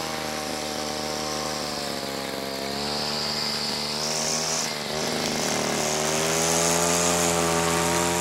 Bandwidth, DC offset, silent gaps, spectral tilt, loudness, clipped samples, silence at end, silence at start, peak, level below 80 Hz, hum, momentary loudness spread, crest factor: 16 kHz; under 0.1%; none; -2 dB/octave; -24 LUFS; under 0.1%; 0 s; 0 s; -8 dBFS; -52 dBFS; none; 8 LU; 18 dB